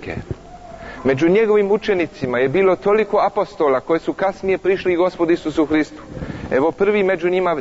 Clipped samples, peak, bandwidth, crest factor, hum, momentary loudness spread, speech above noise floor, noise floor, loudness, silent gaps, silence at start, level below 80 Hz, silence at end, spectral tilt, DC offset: under 0.1%; -6 dBFS; 8 kHz; 12 dB; none; 14 LU; 20 dB; -37 dBFS; -18 LUFS; none; 0 s; -44 dBFS; 0 s; -7 dB/octave; under 0.1%